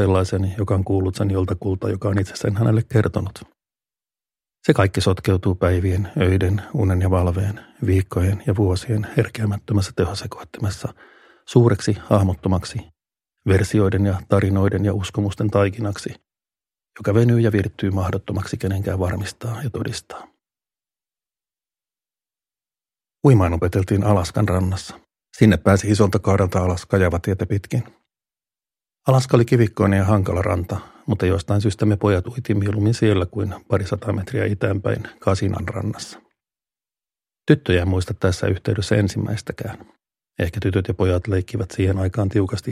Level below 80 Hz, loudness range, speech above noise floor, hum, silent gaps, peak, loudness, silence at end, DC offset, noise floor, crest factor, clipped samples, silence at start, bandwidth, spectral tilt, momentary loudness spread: -42 dBFS; 5 LU; over 71 dB; none; none; 0 dBFS; -20 LUFS; 0 s; under 0.1%; under -90 dBFS; 20 dB; under 0.1%; 0 s; 13.5 kHz; -7 dB/octave; 11 LU